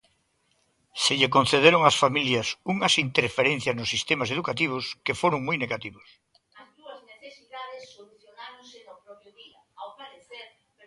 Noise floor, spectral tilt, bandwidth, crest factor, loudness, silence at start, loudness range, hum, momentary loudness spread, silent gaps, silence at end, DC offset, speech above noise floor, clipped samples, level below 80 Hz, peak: -70 dBFS; -3.5 dB/octave; 11.5 kHz; 26 dB; -23 LUFS; 0.95 s; 23 LU; none; 25 LU; none; 0.4 s; under 0.1%; 46 dB; under 0.1%; -62 dBFS; -2 dBFS